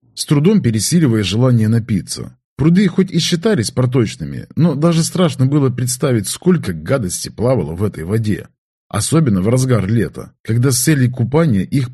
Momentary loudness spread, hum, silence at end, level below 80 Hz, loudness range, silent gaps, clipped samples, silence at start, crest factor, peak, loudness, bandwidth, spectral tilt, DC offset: 8 LU; none; 0 s; -44 dBFS; 3 LU; 2.44-2.56 s, 8.58-8.90 s, 10.40-10.44 s; under 0.1%; 0.15 s; 14 dB; 0 dBFS; -15 LUFS; 13 kHz; -6 dB/octave; under 0.1%